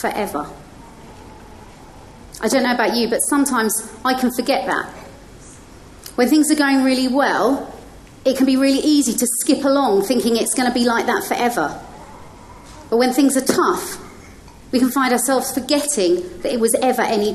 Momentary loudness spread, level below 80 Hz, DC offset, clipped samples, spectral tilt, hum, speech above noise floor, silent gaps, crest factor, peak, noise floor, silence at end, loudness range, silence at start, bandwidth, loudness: 10 LU; -48 dBFS; under 0.1%; under 0.1%; -3 dB/octave; none; 24 dB; none; 18 dB; 0 dBFS; -41 dBFS; 0 s; 4 LU; 0 s; 13 kHz; -17 LUFS